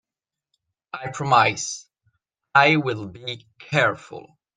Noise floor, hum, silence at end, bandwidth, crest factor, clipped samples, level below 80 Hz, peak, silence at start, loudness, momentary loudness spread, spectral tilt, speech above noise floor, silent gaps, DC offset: -89 dBFS; none; 0.35 s; 9.8 kHz; 22 dB; under 0.1%; -64 dBFS; -2 dBFS; 0.95 s; -20 LUFS; 19 LU; -4 dB/octave; 67 dB; none; under 0.1%